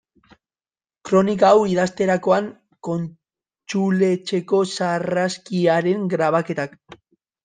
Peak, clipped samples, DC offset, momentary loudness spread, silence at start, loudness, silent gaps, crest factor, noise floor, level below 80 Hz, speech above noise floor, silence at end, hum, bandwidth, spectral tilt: -4 dBFS; under 0.1%; under 0.1%; 12 LU; 1.05 s; -20 LUFS; none; 18 dB; under -90 dBFS; -62 dBFS; over 71 dB; 0.5 s; none; 9.6 kHz; -6 dB/octave